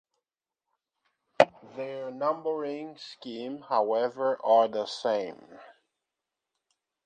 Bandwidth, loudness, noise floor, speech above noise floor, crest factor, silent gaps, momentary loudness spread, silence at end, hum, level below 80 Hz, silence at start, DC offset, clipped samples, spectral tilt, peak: 9.4 kHz; -28 LUFS; -89 dBFS; 60 dB; 28 dB; none; 16 LU; 1.35 s; none; -80 dBFS; 1.4 s; under 0.1%; under 0.1%; -4.5 dB/octave; -2 dBFS